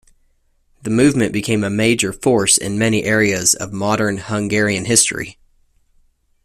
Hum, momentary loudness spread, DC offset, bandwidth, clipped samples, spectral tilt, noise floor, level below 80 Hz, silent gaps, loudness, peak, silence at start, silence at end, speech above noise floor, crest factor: none; 7 LU; under 0.1%; 14.5 kHz; under 0.1%; -3.5 dB/octave; -59 dBFS; -48 dBFS; none; -16 LUFS; 0 dBFS; 0.85 s; 1.1 s; 43 dB; 18 dB